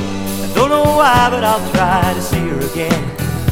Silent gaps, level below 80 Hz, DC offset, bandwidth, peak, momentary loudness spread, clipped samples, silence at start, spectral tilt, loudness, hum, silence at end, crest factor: none; -32 dBFS; under 0.1%; 16.5 kHz; 0 dBFS; 9 LU; under 0.1%; 0 s; -5 dB/octave; -14 LUFS; none; 0 s; 14 dB